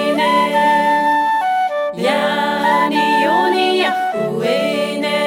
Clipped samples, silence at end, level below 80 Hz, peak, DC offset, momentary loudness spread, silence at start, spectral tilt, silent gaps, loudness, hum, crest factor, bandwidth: under 0.1%; 0 s; -62 dBFS; -2 dBFS; under 0.1%; 5 LU; 0 s; -4.5 dB/octave; none; -15 LUFS; none; 12 dB; 16.5 kHz